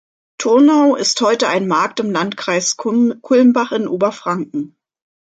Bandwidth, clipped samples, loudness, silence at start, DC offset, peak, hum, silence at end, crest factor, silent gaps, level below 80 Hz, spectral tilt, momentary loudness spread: 9.2 kHz; under 0.1%; -15 LUFS; 0.4 s; under 0.1%; -2 dBFS; none; 0.65 s; 14 dB; none; -66 dBFS; -4 dB/octave; 11 LU